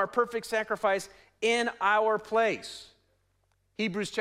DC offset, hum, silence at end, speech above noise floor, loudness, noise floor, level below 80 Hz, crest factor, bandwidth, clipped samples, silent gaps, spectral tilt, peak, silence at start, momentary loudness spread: under 0.1%; none; 0 s; 43 dB; -28 LUFS; -72 dBFS; -68 dBFS; 18 dB; 15 kHz; under 0.1%; none; -3.5 dB/octave; -12 dBFS; 0 s; 16 LU